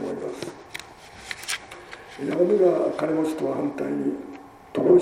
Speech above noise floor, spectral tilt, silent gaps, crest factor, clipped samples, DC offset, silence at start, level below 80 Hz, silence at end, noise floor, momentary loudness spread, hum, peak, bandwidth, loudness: 22 dB; -5.5 dB/octave; none; 18 dB; under 0.1%; under 0.1%; 0 s; -62 dBFS; 0 s; -44 dBFS; 21 LU; none; -6 dBFS; 15 kHz; -25 LUFS